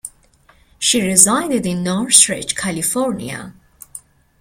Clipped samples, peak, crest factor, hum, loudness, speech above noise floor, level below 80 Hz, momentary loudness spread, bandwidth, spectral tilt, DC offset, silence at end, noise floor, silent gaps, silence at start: 0.1%; 0 dBFS; 18 dB; none; -14 LUFS; 36 dB; -52 dBFS; 24 LU; 16.5 kHz; -2.5 dB/octave; under 0.1%; 0.4 s; -53 dBFS; none; 0.05 s